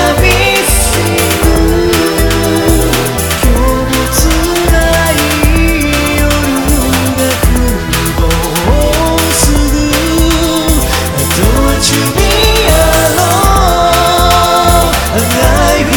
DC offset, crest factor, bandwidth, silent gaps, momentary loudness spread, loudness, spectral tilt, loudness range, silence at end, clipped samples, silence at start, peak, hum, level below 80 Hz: 0.2%; 8 dB; over 20 kHz; none; 4 LU; -9 LUFS; -4 dB/octave; 2 LU; 0 s; under 0.1%; 0 s; 0 dBFS; none; -14 dBFS